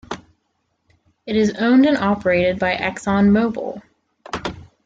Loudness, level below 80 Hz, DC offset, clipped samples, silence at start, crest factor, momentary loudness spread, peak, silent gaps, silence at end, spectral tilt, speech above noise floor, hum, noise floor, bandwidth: -18 LUFS; -50 dBFS; under 0.1%; under 0.1%; 0.1 s; 14 dB; 18 LU; -4 dBFS; none; 0.25 s; -6.5 dB/octave; 53 dB; none; -70 dBFS; 8.8 kHz